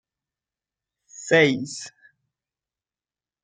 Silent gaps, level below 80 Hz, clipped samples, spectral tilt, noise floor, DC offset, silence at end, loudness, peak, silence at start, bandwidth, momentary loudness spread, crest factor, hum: none; -70 dBFS; under 0.1%; -4.5 dB/octave; under -90 dBFS; under 0.1%; 1.55 s; -20 LUFS; -4 dBFS; 1.2 s; 9.6 kHz; 21 LU; 22 dB; none